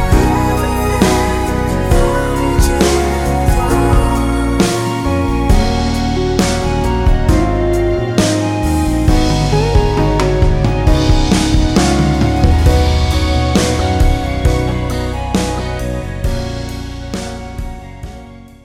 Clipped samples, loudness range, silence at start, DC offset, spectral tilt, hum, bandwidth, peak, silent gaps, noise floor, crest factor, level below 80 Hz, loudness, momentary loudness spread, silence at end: under 0.1%; 5 LU; 0 s; under 0.1%; -6 dB/octave; none; 16.5 kHz; 0 dBFS; none; -34 dBFS; 12 dB; -18 dBFS; -14 LUFS; 9 LU; 0.15 s